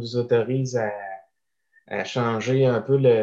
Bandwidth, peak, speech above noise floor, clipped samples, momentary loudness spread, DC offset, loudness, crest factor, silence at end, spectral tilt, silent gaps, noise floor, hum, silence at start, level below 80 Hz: 7.6 kHz; -8 dBFS; 51 dB; under 0.1%; 14 LU; under 0.1%; -23 LUFS; 16 dB; 0 s; -6.5 dB/octave; none; -73 dBFS; none; 0 s; -66 dBFS